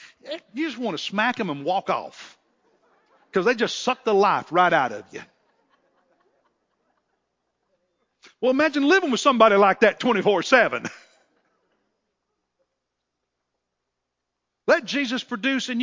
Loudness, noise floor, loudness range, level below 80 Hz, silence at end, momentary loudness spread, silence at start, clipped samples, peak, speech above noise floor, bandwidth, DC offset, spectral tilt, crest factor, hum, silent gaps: -21 LUFS; -81 dBFS; 10 LU; -74 dBFS; 0 s; 14 LU; 0.25 s; under 0.1%; -2 dBFS; 60 dB; 7.6 kHz; under 0.1%; -4 dB/octave; 22 dB; none; none